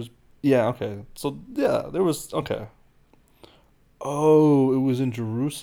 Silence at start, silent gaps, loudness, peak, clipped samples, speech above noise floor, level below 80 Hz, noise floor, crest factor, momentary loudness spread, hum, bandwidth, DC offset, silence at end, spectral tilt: 0 s; none; -23 LUFS; -8 dBFS; under 0.1%; 36 dB; -56 dBFS; -58 dBFS; 16 dB; 15 LU; none; 18 kHz; under 0.1%; 0 s; -7 dB/octave